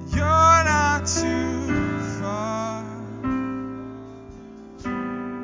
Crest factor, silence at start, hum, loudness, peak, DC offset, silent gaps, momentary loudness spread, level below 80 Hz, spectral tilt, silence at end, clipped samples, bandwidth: 20 dB; 0 s; none; -22 LUFS; -4 dBFS; under 0.1%; none; 23 LU; -36 dBFS; -4.5 dB/octave; 0 s; under 0.1%; 7.6 kHz